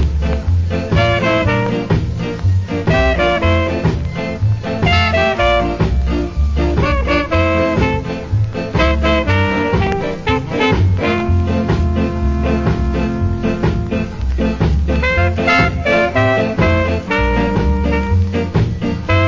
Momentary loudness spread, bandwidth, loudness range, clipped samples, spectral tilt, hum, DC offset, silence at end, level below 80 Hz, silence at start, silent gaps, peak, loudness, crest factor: 5 LU; 7.6 kHz; 2 LU; under 0.1%; -7 dB/octave; none; under 0.1%; 0 s; -20 dBFS; 0 s; none; -2 dBFS; -16 LUFS; 14 dB